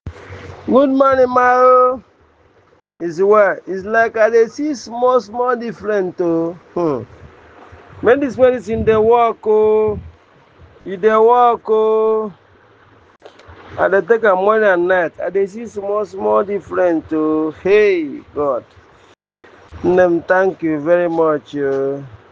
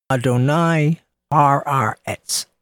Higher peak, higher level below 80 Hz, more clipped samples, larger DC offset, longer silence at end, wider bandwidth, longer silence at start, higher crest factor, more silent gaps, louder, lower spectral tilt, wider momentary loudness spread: about the same, 0 dBFS vs -2 dBFS; first, -50 dBFS vs -58 dBFS; neither; neither; about the same, 0.15 s vs 0.2 s; second, 7.4 kHz vs 17.5 kHz; about the same, 0.05 s vs 0.1 s; about the same, 16 dB vs 18 dB; neither; first, -15 LUFS vs -18 LUFS; about the same, -6.5 dB/octave vs -5.5 dB/octave; first, 11 LU vs 7 LU